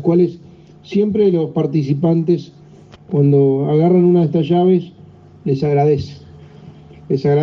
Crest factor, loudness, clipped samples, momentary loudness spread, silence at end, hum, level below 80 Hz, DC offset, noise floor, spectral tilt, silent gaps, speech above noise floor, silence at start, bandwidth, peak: 12 dB; -15 LUFS; under 0.1%; 9 LU; 0 s; none; -54 dBFS; under 0.1%; -41 dBFS; -10 dB/octave; none; 27 dB; 0 s; 6.4 kHz; -4 dBFS